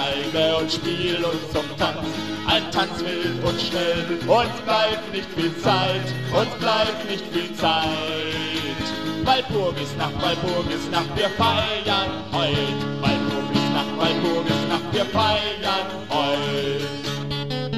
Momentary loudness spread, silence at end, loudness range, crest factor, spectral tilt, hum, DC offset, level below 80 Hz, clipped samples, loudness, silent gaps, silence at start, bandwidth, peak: 6 LU; 0 s; 2 LU; 18 dB; -5 dB/octave; none; 0.7%; -46 dBFS; under 0.1%; -22 LUFS; none; 0 s; 14 kHz; -4 dBFS